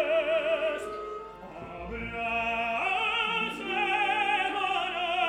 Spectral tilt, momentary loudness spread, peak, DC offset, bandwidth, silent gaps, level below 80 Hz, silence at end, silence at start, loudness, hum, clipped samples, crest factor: -3.5 dB/octave; 14 LU; -14 dBFS; under 0.1%; 15 kHz; none; -54 dBFS; 0 s; 0 s; -28 LUFS; none; under 0.1%; 16 dB